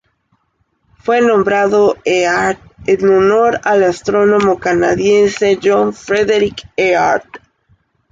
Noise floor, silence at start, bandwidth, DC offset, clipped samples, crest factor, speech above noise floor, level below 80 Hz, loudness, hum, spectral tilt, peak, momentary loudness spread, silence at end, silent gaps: -63 dBFS; 1.05 s; 7.8 kHz; under 0.1%; under 0.1%; 12 dB; 51 dB; -46 dBFS; -13 LUFS; none; -5 dB/octave; -2 dBFS; 5 LU; 0.75 s; none